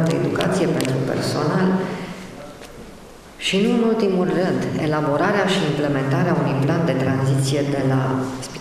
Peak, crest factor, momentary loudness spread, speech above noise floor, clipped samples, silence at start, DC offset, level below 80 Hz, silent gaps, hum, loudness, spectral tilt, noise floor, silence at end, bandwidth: -4 dBFS; 16 dB; 15 LU; 22 dB; under 0.1%; 0 s; under 0.1%; -50 dBFS; none; none; -20 LUFS; -6 dB/octave; -41 dBFS; 0 s; 14.5 kHz